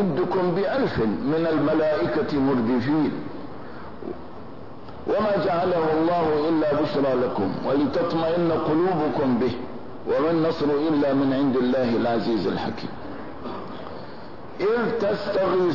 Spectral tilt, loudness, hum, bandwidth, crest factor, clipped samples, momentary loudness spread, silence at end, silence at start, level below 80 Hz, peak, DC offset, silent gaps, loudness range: -8.5 dB/octave; -23 LUFS; none; 6 kHz; 10 dB; under 0.1%; 15 LU; 0 s; 0 s; -54 dBFS; -12 dBFS; 1%; none; 4 LU